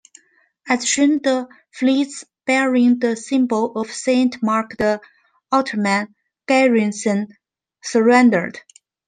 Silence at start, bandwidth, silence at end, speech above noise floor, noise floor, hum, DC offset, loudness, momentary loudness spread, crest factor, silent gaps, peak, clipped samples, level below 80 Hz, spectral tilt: 0.65 s; 9.6 kHz; 0.5 s; 41 dB; -59 dBFS; none; under 0.1%; -18 LUFS; 12 LU; 16 dB; none; -2 dBFS; under 0.1%; -60 dBFS; -4 dB/octave